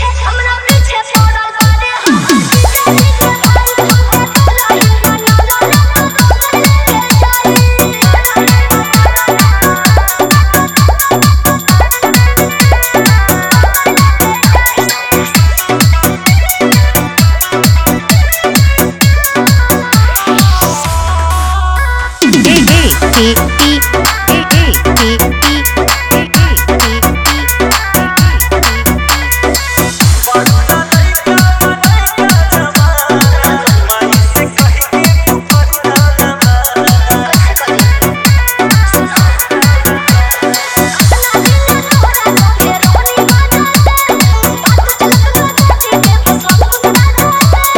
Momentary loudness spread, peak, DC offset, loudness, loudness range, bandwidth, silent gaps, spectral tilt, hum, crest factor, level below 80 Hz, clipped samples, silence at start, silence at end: 2 LU; 0 dBFS; under 0.1%; -8 LUFS; 1 LU; over 20 kHz; none; -4 dB/octave; none; 8 dB; -14 dBFS; 1%; 0 s; 0 s